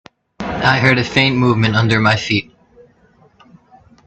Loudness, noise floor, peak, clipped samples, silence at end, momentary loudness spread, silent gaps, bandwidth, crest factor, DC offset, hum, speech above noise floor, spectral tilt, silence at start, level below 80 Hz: -14 LUFS; -52 dBFS; 0 dBFS; under 0.1%; 1.65 s; 7 LU; none; 8.4 kHz; 18 dB; under 0.1%; none; 38 dB; -6 dB/octave; 0.4 s; -44 dBFS